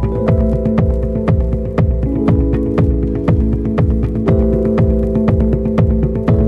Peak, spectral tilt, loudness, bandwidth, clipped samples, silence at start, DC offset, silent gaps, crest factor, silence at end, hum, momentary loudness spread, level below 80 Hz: -2 dBFS; -11 dB/octave; -15 LUFS; 5 kHz; under 0.1%; 0 s; under 0.1%; none; 12 dB; 0 s; none; 2 LU; -18 dBFS